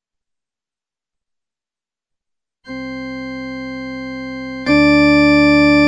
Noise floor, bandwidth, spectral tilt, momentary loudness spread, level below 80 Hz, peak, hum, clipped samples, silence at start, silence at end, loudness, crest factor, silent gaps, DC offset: under -90 dBFS; 8.6 kHz; -6 dB/octave; 16 LU; -40 dBFS; -4 dBFS; none; under 0.1%; 2.65 s; 0 s; -11 LUFS; 14 dB; none; under 0.1%